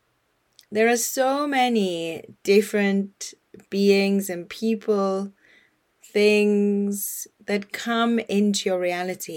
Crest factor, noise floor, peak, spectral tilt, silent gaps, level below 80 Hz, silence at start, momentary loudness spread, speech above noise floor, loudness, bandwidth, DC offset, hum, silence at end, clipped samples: 18 dB; -69 dBFS; -6 dBFS; -4.5 dB/octave; none; -74 dBFS; 0.7 s; 12 LU; 47 dB; -23 LUFS; 18.5 kHz; under 0.1%; none; 0 s; under 0.1%